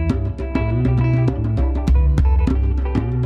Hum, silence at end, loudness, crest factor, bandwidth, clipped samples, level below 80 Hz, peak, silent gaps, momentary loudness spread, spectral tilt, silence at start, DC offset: none; 0 s; -19 LUFS; 12 dB; 5 kHz; under 0.1%; -20 dBFS; -4 dBFS; none; 5 LU; -9.5 dB/octave; 0 s; under 0.1%